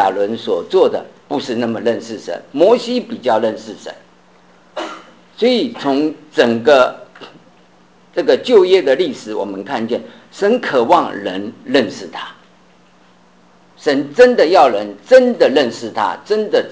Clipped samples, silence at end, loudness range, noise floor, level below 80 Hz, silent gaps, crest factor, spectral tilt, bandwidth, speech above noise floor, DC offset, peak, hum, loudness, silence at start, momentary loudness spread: under 0.1%; 0 s; 6 LU; -49 dBFS; -60 dBFS; none; 16 dB; -5 dB/octave; 8 kHz; 35 dB; 0.2%; 0 dBFS; none; -15 LUFS; 0 s; 17 LU